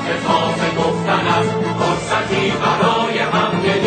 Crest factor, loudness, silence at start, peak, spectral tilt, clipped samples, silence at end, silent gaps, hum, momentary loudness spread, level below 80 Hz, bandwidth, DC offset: 16 dB; -17 LUFS; 0 s; -2 dBFS; -5 dB/octave; under 0.1%; 0 s; none; none; 3 LU; -46 dBFS; 9.2 kHz; under 0.1%